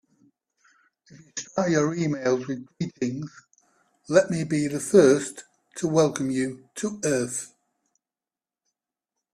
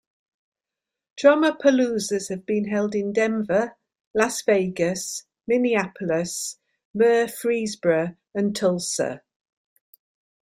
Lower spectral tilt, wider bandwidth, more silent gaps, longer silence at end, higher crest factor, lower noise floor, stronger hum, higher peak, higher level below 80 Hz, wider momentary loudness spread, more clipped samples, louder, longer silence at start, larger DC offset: about the same, -5.5 dB/octave vs -4.5 dB/octave; second, 14 kHz vs 16 kHz; second, none vs 4.07-4.14 s, 6.85-6.94 s; first, 1.9 s vs 1.3 s; about the same, 22 dB vs 20 dB; about the same, under -90 dBFS vs -87 dBFS; neither; about the same, -4 dBFS vs -4 dBFS; about the same, -66 dBFS vs -66 dBFS; first, 16 LU vs 10 LU; neither; about the same, -24 LUFS vs -23 LUFS; first, 1.35 s vs 1.15 s; neither